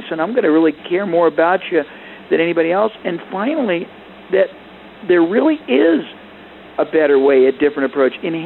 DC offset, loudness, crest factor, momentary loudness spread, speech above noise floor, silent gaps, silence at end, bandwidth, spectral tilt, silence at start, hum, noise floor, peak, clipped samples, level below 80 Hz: under 0.1%; -16 LUFS; 12 dB; 10 LU; 23 dB; none; 0 s; 4.2 kHz; -9 dB/octave; 0 s; none; -38 dBFS; -4 dBFS; under 0.1%; -60 dBFS